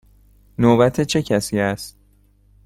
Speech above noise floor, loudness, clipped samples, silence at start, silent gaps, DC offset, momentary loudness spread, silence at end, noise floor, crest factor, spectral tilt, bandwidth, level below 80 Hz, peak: 38 dB; -18 LUFS; under 0.1%; 0.6 s; none; under 0.1%; 18 LU; 0.75 s; -55 dBFS; 18 dB; -5.5 dB/octave; 15.5 kHz; -48 dBFS; -2 dBFS